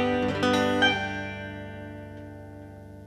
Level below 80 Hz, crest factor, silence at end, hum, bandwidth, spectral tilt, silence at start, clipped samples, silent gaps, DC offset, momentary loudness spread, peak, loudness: -52 dBFS; 20 dB; 0 s; 50 Hz at -70 dBFS; 14 kHz; -5 dB/octave; 0 s; under 0.1%; none; under 0.1%; 21 LU; -8 dBFS; -25 LUFS